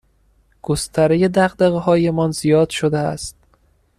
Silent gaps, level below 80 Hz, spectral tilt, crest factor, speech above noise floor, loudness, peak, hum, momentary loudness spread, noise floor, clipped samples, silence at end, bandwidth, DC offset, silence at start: none; -46 dBFS; -6 dB/octave; 16 dB; 41 dB; -17 LUFS; -4 dBFS; none; 9 LU; -58 dBFS; under 0.1%; 0.65 s; 14 kHz; under 0.1%; 0.7 s